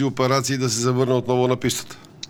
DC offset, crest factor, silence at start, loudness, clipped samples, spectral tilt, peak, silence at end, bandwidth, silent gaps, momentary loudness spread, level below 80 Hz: under 0.1%; 18 dB; 0 s; -21 LUFS; under 0.1%; -5 dB/octave; -4 dBFS; 0 s; 17.5 kHz; none; 6 LU; -56 dBFS